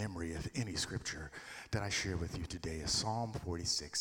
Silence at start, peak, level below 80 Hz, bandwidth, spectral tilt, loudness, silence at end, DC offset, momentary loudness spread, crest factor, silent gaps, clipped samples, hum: 0 s; -22 dBFS; -54 dBFS; 17.5 kHz; -3.5 dB/octave; -38 LUFS; 0 s; under 0.1%; 8 LU; 18 dB; none; under 0.1%; none